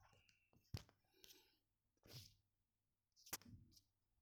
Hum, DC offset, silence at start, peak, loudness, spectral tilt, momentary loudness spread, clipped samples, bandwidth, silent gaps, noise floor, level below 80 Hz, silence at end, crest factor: none; under 0.1%; 0 s; -36 dBFS; -59 LUFS; -3 dB/octave; 14 LU; under 0.1%; over 20 kHz; none; under -90 dBFS; -78 dBFS; 0.4 s; 28 dB